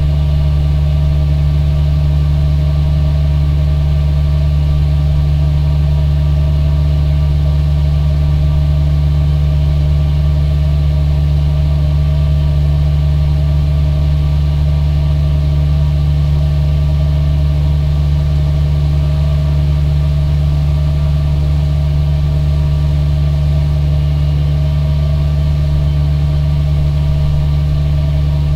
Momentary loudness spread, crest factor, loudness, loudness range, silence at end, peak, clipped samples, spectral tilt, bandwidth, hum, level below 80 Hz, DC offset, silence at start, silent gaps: 1 LU; 8 dB; -14 LUFS; 1 LU; 0 s; -4 dBFS; under 0.1%; -8.5 dB/octave; 5.8 kHz; none; -14 dBFS; under 0.1%; 0 s; none